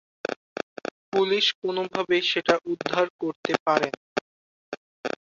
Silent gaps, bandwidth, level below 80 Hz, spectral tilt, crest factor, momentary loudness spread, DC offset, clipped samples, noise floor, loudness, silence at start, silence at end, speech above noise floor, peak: 0.36-0.56 s, 0.63-0.76 s, 0.91-1.12 s, 1.55-1.62 s, 3.10-3.19 s, 3.36-3.43 s, 3.60-3.66 s, 3.97-5.04 s; 7.6 kHz; -70 dBFS; -4 dB/octave; 24 dB; 13 LU; under 0.1%; under 0.1%; under -90 dBFS; -26 LUFS; 0.3 s; 0.1 s; over 65 dB; -4 dBFS